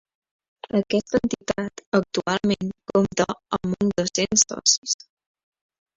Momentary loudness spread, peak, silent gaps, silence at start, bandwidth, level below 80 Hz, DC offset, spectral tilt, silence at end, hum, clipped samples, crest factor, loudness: 9 LU; -4 dBFS; 1.86-1.92 s, 4.78-4.82 s; 0.75 s; 7.8 kHz; -54 dBFS; under 0.1%; -3.5 dB/octave; 1.05 s; none; under 0.1%; 22 dB; -23 LUFS